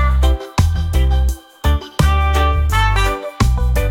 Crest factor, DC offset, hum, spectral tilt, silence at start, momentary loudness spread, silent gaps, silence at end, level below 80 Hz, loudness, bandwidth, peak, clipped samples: 12 dB; under 0.1%; none; -5.5 dB/octave; 0 s; 4 LU; none; 0 s; -16 dBFS; -17 LUFS; 16.5 kHz; -2 dBFS; under 0.1%